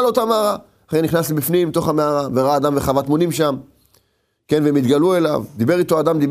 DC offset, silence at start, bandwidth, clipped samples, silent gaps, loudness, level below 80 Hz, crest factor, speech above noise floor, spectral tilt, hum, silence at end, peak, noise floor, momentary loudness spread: under 0.1%; 0 s; 15.5 kHz; under 0.1%; none; -17 LUFS; -48 dBFS; 14 dB; 49 dB; -6 dB/octave; none; 0 s; -2 dBFS; -65 dBFS; 5 LU